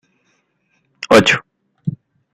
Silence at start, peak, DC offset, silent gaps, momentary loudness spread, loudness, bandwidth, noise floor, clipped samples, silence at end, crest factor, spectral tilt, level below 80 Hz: 1.1 s; 0 dBFS; under 0.1%; none; 17 LU; -15 LUFS; 15 kHz; -65 dBFS; under 0.1%; 0.45 s; 18 dB; -4.5 dB/octave; -54 dBFS